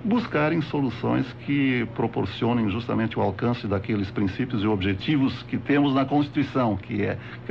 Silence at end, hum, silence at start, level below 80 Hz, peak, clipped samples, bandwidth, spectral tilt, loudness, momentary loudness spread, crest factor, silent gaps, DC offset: 0 s; none; 0 s; -52 dBFS; -10 dBFS; under 0.1%; 6.6 kHz; -8.5 dB/octave; -25 LUFS; 5 LU; 14 dB; none; 0.1%